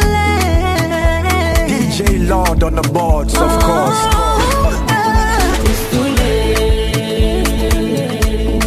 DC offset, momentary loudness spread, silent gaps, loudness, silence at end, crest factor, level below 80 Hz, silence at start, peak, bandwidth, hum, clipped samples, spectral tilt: under 0.1%; 3 LU; none; -14 LUFS; 0 s; 12 dB; -16 dBFS; 0 s; 0 dBFS; 15 kHz; none; under 0.1%; -5 dB/octave